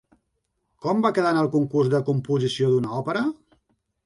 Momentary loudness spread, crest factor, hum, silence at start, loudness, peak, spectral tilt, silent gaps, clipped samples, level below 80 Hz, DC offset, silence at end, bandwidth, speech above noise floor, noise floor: 6 LU; 16 dB; none; 0.85 s; -23 LUFS; -8 dBFS; -7 dB/octave; none; under 0.1%; -64 dBFS; under 0.1%; 0.7 s; 11.5 kHz; 53 dB; -75 dBFS